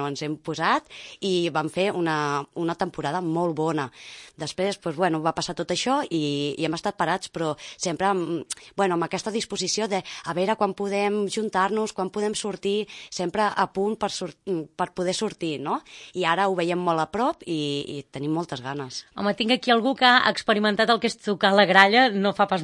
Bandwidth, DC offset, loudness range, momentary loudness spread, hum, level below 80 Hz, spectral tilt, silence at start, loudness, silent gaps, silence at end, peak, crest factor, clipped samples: 11.5 kHz; under 0.1%; 6 LU; 12 LU; none; -64 dBFS; -4 dB/octave; 0 s; -24 LUFS; none; 0 s; 0 dBFS; 24 dB; under 0.1%